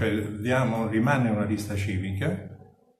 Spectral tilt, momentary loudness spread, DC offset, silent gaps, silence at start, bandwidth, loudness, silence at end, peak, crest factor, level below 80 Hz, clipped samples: -7 dB/octave; 7 LU; under 0.1%; none; 0 s; 14.5 kHz; -27 LUFS; 0.4 s; -10 dBFS; 16 dB; -60 dBFS; under 0.1%